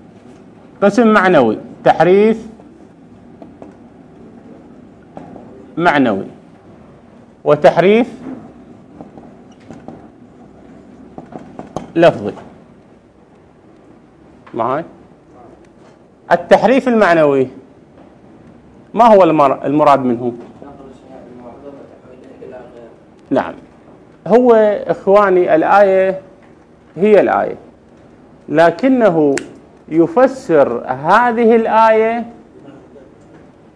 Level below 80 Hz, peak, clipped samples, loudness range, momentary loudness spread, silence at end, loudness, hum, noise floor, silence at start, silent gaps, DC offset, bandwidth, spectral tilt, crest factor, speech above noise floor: -52 dBFS; 0 dBFS; 0.3%; 14 LU; 24 LU; 1.05 s; -12 LUFS; none; -45 dBFS; 0.8 s; none; under 0.1%; 11 kHz; -6.5 dB/octave; 16 dB; 34 dB